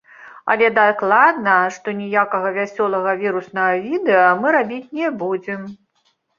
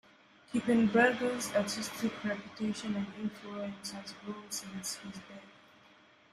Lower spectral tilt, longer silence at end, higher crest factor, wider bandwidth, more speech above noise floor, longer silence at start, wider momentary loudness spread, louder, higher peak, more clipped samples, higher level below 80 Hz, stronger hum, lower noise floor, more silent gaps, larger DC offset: first, -6 dB/octave vs -4 dB/octave; second, 0.65 s vs 0.85 s; about the same, 18 dB vs 22 dB; second, 7.4 kHz vs 14.5 kHz; first, 47 dB vs 28 dB; second, 0.2 s vs 0.5 s; second, 12 LU vs 17 LU; first, -17 LUFS vs -34 LUFS; first, -2 dBFS vs -14 dBFS; neither; about the same, -68 dBFS vs -70 dBFS; neither; about the same, -65 dBFS vs -62 dBFS; neither; neither